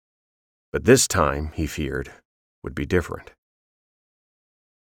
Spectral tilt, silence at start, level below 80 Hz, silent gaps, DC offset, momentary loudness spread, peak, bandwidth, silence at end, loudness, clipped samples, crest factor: -4.5 dB/octave; 0.75 s; -40 dBFS; 2.25-2.62 s; under 0.1%; 20 LU; -2 dBFS; over 20 kHz; 1.65 s; -22 LUFS; under 0.1%; 22 dB